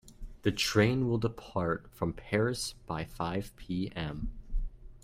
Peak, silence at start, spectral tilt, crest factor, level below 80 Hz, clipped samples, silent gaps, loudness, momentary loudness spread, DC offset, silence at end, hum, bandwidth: -12 dBFS; 0.05 s; -5.5 dB/octave; 20 dB; -44 dBFS; under 0.1%; none; -33 LUFS; 15 LU; under 0.1%; 0.05 s; none; 16 kHz